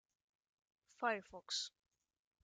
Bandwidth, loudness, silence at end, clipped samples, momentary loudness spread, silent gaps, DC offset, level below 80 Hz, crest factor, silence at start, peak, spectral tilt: 10 kHz; -43 LUFS; 0.75 s; under 0.1%; 5 LU; none; under 0.1%; -84 dBFS; 24 dB; 1 s; -24 dBFS; -1 dB/octave